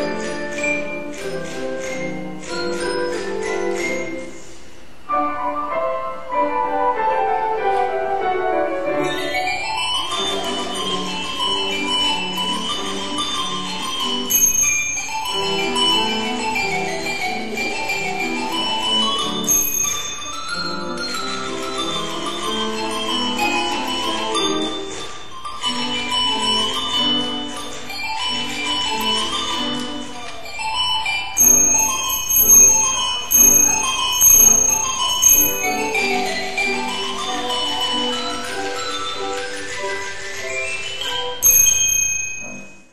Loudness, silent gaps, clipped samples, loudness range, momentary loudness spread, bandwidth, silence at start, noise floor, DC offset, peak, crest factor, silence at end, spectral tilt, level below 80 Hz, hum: -18 LUFS; none; under 0.1%; 12 LU; 15 LU; 16 kHz; 0 s; -43 dBFS; 3%; -2 dBFS; 18 dB; 0 s; -0.5 dB/octave; -48 dBFS; none